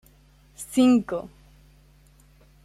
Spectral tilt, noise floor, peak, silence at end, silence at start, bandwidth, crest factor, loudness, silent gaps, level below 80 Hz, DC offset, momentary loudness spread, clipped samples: -5 dB/octave; -56 dBFS; -8 dBFS; 1.35 s; 0.6 s; 13.5 kHz; 18 dB; -22 LUFS; none; -56 dBFS; under 0.1%; 22 LU; under 0.1%